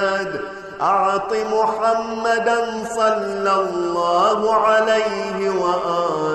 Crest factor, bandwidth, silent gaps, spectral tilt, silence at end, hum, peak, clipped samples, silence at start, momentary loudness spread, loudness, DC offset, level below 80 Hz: 12 dB; 12 kHz; none; -4 dB/octave; 0 s; none; -6 dBFS; under 0.1%; 0 s; 6 LU; -19 LUFS; under 0.1%; -56 dBFS